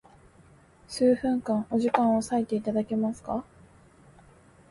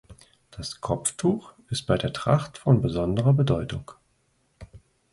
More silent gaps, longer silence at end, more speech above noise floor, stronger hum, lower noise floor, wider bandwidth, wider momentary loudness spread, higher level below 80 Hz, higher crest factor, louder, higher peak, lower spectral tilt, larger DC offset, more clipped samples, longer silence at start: neither; first, 1.3 s vs 0.35 s; second, 31 dB vs 44 dB; neither; second, -56 dBFS vs -68 dBFS; about the same, 11.5 kHz vs 11.5 kHz; second, 10 LU vs 13 LU; second, -60 dBFS vs -48 dBFS; about the same, 22 dB vs 18 dB; about the same, -27 LUFS vs -25 LUFS; about the same, -8 dBFS vs -8 dBFS; about the same, -6 dB/octave vs -6 dB/octave; neither; neither; first, 0.9 s vs 0.1 s